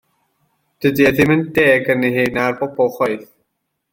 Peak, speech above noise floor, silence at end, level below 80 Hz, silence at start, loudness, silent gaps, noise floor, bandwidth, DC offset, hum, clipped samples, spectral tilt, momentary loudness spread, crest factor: -2 dBFS; 58 dB; 0.7 s; -50 dBFS; 0.8 s; -16 LUFS; none; -73 dBFS; 17 kHz; under 0.1%; none; under 0.1%; -6.5 dB/octave; 7 LU; 16 dB